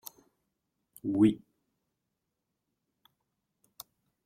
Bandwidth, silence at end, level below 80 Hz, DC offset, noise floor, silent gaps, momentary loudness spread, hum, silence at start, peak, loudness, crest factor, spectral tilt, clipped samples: 16.5 kHz; 2.9 s; -70 dBFS; under 0.1%; -85 dBFS; none; 24 LU; none; 1.05 s; -12 dBFS; -28 LUFS; 24 dB; -7 dB/octave; under 0.1%